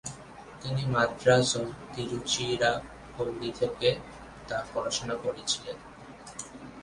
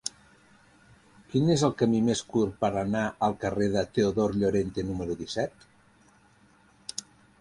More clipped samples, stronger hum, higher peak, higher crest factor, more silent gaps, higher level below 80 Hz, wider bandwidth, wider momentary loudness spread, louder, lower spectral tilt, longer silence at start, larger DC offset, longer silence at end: neither; neither; about the same, -10 dBFS vs -10 dBFS; about the same, 22 dB vs 20 dB; neither; about the same, -56 dBFS vs -54 dBFS; about the same, 11.5 kHz vs 11.5 kHz; first, 20 LU vs 13 LU; about the same, -29 LUFS vs -28 LUFS; second, -3.5 dB/octave vs -5.5 dB/octave; about the same, 0.05 s vs 0.05 s; neither; second, 0 s vs 0.4 s